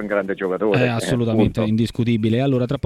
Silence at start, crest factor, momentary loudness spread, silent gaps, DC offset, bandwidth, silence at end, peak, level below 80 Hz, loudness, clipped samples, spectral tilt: 0 s; 14 dB; 4 LU; none; under 0.1%; 13.5 kHz; 0.05 s; -6 dBFS; -44 dBFS; -20 LUFS; under 0.1%; -7 dB/octave